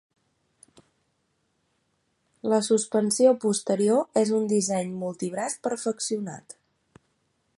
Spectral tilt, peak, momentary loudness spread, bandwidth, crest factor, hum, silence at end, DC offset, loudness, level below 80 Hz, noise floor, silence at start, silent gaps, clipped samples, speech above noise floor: -4.5 dB/octave; -8 dBFS; 11 LU; 11.5 kHz; 20 dB; none; 1.05 s; under 0.1%; -25 LUFS; -74 dBFS; -73 dBFS; 2.45 s; none; under 0.1%; 49 dB